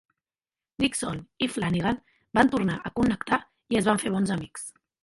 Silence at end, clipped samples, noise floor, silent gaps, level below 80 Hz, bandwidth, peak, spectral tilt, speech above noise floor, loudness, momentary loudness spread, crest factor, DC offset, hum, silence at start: 0.35 s; under 0.1%; under -90 dBFS; none; -52 dBFS; 11.5 kHz; -4 dBFS; -5 dB/octave; over 64 dB; -26 LUFS; 11 LU; 22 dB; under 0.1%; none; 0.8 s